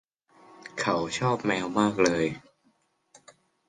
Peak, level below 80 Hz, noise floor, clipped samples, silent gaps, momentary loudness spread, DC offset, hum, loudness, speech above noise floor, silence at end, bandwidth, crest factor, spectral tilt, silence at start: -8 dBFS; -62 dBFS; -69 dBFS; under 0.1%; none; 17 LU; under 0.1%; none; -26 LUFS; 43 dB; 1.3 s; 10.5 kHz; 20 dB; -5 dB/octave; 0.65 s